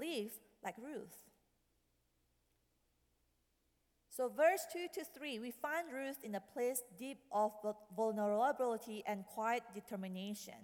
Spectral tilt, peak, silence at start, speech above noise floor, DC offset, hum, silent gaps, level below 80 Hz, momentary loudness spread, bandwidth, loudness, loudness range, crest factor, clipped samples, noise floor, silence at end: -4 dB/octave; -20 dBFS; 0 s; 40 dB; under 0.1%; none; none; -84 dBFS; 14 LU; 19 kHz; -41 LUFS; 15 LU; 22 dB; under 0.1%; -80 dBFS; 0 s